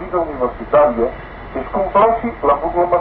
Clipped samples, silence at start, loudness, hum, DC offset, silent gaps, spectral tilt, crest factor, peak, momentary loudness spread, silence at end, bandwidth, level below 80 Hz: under 0.1%; 0 s; -16 LUFS; none; under 0.1%; none; -11 dB/octave; 12 dB; -4 dBFS; 11 LU; 0 s; 4.4 kHz; -36 dBFS